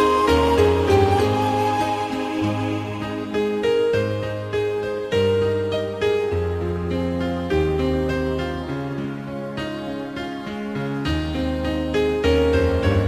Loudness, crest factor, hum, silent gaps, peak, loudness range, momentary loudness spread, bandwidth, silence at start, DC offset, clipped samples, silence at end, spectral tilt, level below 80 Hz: -22 LUFS; 18 dB; none; none; -4 dBFS; 6 LU; 11 LU; 15.5 kHz; 0 s; under 0.1%; under 0.1%; 0 s; -6.5 dB/octave; -34 dBFS